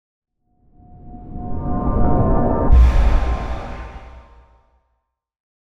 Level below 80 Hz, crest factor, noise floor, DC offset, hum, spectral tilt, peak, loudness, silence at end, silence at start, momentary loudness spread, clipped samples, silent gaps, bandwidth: -20 dBFS; 16 dB; -72 dBFS; under 0.1%; none; -9 dB/octave; -4 dBFS; -19 LUFS; 0.25 s; 0.2 s; 22 LU; under 0.1%; none; 6.2 kHz